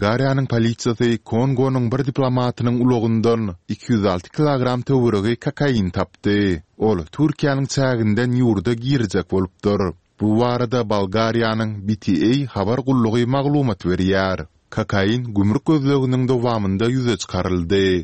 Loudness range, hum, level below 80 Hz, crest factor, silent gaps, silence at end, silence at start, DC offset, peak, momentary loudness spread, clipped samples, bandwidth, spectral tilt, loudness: 1 LU; none; -46 dBFS; 16 dB; none; 0 s; 0 s; 0.3%; -2 dBFS; 4 LU; under 0.1%; 8.6 kHz; -7 dB/octave; -19 LUFS